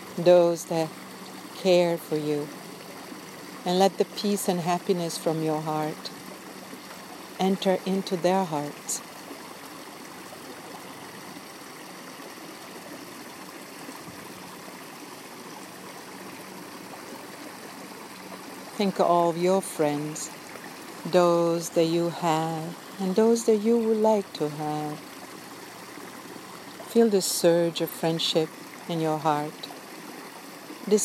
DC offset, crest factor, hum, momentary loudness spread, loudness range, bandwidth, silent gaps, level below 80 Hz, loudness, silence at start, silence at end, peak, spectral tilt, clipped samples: under 0.1%; 22 dB; none; 19 LU; 15 LU; 16 kHz; none; -78 dBFS; -25 LUFS; 0 s; 0 s; -6 dBFS; -5 dB/octave; under 0.1%